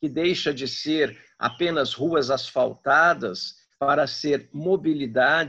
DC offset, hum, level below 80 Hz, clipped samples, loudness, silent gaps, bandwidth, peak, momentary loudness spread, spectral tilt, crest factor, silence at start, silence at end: under 0.1%; none; -64 dBFS; under 0.1%; -23 LUFS; none; 8.2 kHz; -6 dBFS; 9 LU; -4.5 dB/octave; 18 dB; 0 s; 0 s